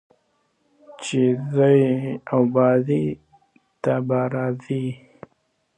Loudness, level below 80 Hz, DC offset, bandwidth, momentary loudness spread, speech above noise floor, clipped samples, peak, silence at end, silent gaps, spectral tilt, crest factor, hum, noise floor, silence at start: -21 LUFS; -64 dBFS; under 0.1%; 9.4 kHz; 12 LU; 48 dB; under 0.1%; -4 dBFS; 0.8 s; none; -7.5 dB/octave; 18 dB; none; -68 dBFS; 0.9 s